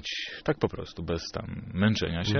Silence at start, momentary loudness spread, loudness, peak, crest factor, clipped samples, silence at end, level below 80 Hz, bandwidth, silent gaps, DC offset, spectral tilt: 0 s; 10 LU; -30 LUFS; -10 dBFS; 20 dB; under 0.1%; 0 s; -48 dBFS; 6.6 kHz; none; under 0.1%; -4.5 dB/octave